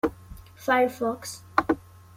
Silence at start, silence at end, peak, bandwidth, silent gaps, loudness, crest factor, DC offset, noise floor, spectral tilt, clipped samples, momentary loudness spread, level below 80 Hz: 0.05 s; 0.4 s; -4 dBFS; 16.5 kHz; none; -27 LUFS; 24 dB; under 0.1%; -46 dBFS; -4.5 dB/octave; under 0.1%; 10 LU; -52 dBFS